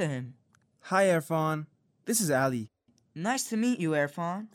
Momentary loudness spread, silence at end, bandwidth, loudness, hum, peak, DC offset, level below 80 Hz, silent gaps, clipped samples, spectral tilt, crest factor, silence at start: 19 LU; 0.1 s; 17.5 kHz; -29 LUFS; none; -12 dBFS; under 0.1%; -74 dBFS; none; under 0.1%; -4.5 dB/octave; 18 dB; 0 s